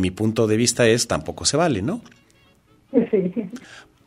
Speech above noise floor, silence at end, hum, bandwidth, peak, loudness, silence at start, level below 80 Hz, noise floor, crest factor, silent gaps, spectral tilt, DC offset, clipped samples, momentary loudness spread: 36 dB; 0.25 s; none; 16 kHz; -4 dBFS; -20 LUFS; 0 s; -50 dBFS; -56 dBFS; 18 dB; none; -4.5 dB/octave; under 0.1%; under 0.1%; 13 LU